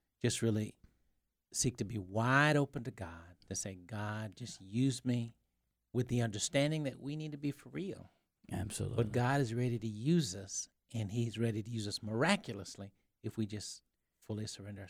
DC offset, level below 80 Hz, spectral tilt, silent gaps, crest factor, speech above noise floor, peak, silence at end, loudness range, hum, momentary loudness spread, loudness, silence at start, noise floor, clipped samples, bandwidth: under 0.1%; -64 dBFS; -5 dB/octave; none; 24 dB; 47 dB; -14 dBFS; 0 s; 3 LU; none; 13 LU; -37 LUFS; 0.25 s; -83 dBFS; under 0.1%; 15.5 kHz